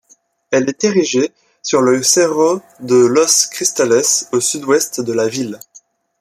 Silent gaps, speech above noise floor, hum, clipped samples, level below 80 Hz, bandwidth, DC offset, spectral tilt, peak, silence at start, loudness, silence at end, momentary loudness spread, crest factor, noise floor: none; 39 dB; none; under 0.1%; -62 dBFS; 15 kHz; under 0.1%; -2.5 dB/octave; 0 dBFS; 0.5 s; -14 LUFS; 0.4 s; 10 LU; 16 dB; -53 dBFS